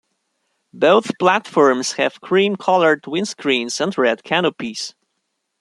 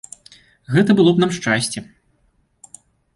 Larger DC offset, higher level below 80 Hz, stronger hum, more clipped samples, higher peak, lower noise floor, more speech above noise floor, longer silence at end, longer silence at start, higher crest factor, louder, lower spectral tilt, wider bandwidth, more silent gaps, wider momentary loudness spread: neither; second, -68 dBFS vs -56 dBFS; neither; neither; about the same, -2 dBFS vs -4 dBFS; first, -73 dBFS vs -62 dBFS; first, 56 dB vs 46 dB; second, 0.7 s vs 1.35 s; about the same, 0.75 s vs 0.7 s; about the same, 18 dB vs 16 dB; about the same, -17 LUFS vs -17 LUFS; second, -4 dB/octave vs -5.5 dB/octave; about the same, 12 kHz vs 11.5 kHz; neither; second, 8 LU vs 15 LU